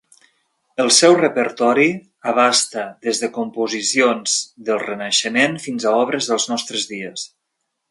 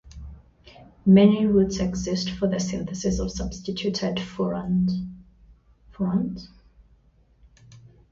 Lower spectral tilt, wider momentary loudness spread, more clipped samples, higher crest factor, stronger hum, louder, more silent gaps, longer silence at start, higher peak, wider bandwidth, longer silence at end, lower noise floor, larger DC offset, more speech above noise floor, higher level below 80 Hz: second, -2 dB/octave vs -6.5 dB/octave; second, 11 LU vs 15 LU; neither; about the same, 18 dB vs 20 dB; neither; first, -17 LUFS vs -24 LUFS; neither; first, 0.8 s vs 0.05 s; first, 0 dBFS vs -6 dBFS; first, 11.5 kHz vs 7.6 kHz; first, 0.65 s vs 0.35 s; first, -75 dBFS vs -59 dBFS; neither; first, 57 dB vs 36 dB; second, -70 dBFS vs -44 dBFS